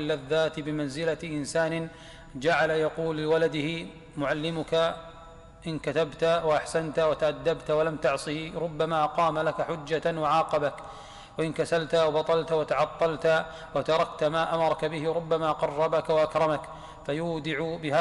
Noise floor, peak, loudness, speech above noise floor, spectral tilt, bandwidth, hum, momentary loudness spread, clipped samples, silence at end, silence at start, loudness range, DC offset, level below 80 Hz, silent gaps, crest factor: -48 dBFS; -14 dBFS; -27 LUFS; 21 dB; -5.5 dB/octave; 11.5 kHz; none; 9 LU; under 0.1%; 0 s; 0 s; 2 LU; under 0.1%; -54 dBFS; none; 14 dB